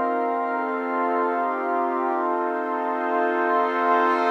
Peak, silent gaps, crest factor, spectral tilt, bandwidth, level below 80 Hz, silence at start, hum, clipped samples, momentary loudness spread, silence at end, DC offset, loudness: -8 dBFS; none; 14 dB; -4.5 dB/octave; 7.8 kHz; -84 dBFS; 0 s; none; under 0.1%; 5 LU; 0 s; under 0.1%; -23 LUFS